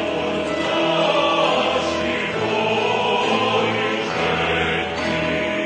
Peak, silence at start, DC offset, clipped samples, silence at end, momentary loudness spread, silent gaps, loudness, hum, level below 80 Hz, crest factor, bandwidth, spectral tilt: -6 dBFS; 0 s; under 0.1%; under 0.1%; 0 s; 4 LU; none; -20 LUFS; none; -48 dBFS; 14 dB; 10 kHz; -4.5 dB/octave